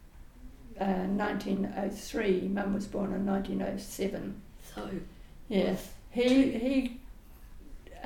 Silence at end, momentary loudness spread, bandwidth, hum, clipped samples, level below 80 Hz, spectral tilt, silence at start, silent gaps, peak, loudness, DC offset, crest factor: 0 s; 16 LU; 18 kHz; none; under 0.1%; -50 dBFS; -6 dB/octave; 0 s; none; -14 dBFS; -32 LUFS; under 0.1%; 18 dB